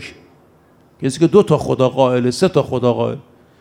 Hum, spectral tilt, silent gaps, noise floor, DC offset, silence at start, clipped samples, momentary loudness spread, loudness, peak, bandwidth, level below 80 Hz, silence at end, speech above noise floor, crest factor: none; -6.5 dB/octave; none; -51 dBFS; under 0.1%; 0 s; under 0.1%; 11 LU; -16 LUFS; 0 dBFS; 13.5 kHz; -52 dBFS; 0.4 s; 36 dB; 16 dB